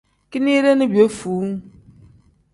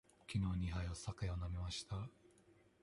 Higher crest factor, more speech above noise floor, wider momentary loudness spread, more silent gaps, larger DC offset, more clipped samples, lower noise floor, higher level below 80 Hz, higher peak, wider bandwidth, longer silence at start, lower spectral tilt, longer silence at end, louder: about the same, 18 dB vs 16 dB; first, 34 dB vs 28 dB; first, 13 LU vs 7 LU; neither; neither; neither; second, -51 dBFS vs -70 dBFS; about the same, -56 dBFS vs -52 dBFS; first, -2 dBFS vs -28 dBFS; about the same, 11.5 kHz vs 11.5 kHz; about the same, 0.3 s vs 0.3 s; about the same, -6 dB/octave vs -5.5 dB/octave; first, 0.85 s vs 0.3 s; first, -18 LUFS vs -44 LUFS